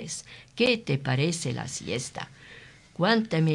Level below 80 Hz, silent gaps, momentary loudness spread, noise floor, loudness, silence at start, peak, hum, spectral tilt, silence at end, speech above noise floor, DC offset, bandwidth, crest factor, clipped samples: -62 dBFS; none; 21 LU; -50 dBFS; -27 LUFS; 0 s; -8 dBFS; none; -5 dB/octave; 0 s; 23 dB; under 0.1%; 11.5 kHz; 20 dB; under 0.1%